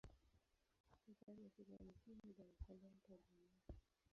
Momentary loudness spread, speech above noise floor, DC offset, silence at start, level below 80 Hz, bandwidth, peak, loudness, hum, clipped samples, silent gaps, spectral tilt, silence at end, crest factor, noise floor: 5 LU; 19 dB; under 0.1%; 0.05 s; -68 dBFS; 6.6 kHz; -42 dBFS; -65 LUFS; none; under 0.1%; 0.80-0.84 s; -8.5 dB/octave; 0.05 s; 22 dB; -83 dBFS